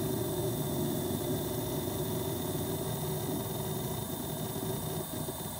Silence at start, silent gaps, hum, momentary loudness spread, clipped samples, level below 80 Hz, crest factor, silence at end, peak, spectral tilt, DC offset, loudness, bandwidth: 0 s; none; none; 3 LU; under 0.1%; -54 dBFS; 14 dB; 0 s; -20 dBFS; -5 dB/octave; under 0.1%; -34 LUFS; 17 kHz